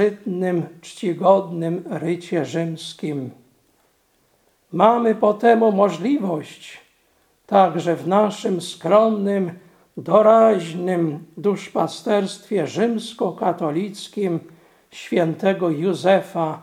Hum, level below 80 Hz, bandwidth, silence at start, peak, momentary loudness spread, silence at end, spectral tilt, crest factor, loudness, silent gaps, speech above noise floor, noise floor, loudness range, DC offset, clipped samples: none; -72 dBFS; 14.5 kHz; 0 s; 0 dBFS; 13 LU; 0 s; -6.5 dB/octave; 20 dB; -20 LUFS; none; 43 dB; -62 dBFS; 5 LU; under 0.1%; under 0.1%